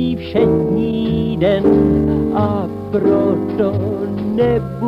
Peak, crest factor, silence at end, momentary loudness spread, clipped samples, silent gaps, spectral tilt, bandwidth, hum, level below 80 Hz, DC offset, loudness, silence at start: -2 dBFS; 14 dB; 0 s; 7 LU; under 0.1%; none; -9.5 dB/octave; 5.6 kHz; none; -34 dBFS; under 0.1%; -16 LUFS; 0 s